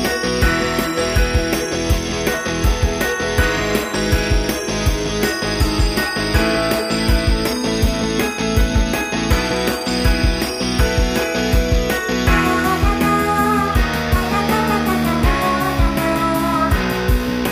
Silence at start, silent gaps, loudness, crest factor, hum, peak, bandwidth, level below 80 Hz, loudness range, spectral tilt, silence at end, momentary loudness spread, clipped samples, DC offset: 0 s; none; -18 LUFS; 16 dB; none; -2 dBFS; 15.5 kHz; -22 dBFS; 2 LU; -4.5 dB/octave; 0 s; 3 LU; under 0.1%; under 0.1%